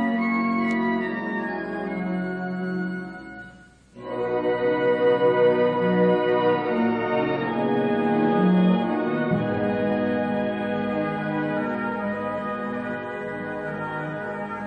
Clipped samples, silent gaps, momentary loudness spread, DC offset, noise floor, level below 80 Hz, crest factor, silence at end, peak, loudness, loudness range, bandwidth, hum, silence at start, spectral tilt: under 0.1%; none; 11 LU; under 0.1%; -49 dBFS; -58 dBFS; 14 dB; 0 s; -8 dBFS; -24 LUFS; 7 LU; 8.4 kHz; none; 0 s; -8.5 dB/octave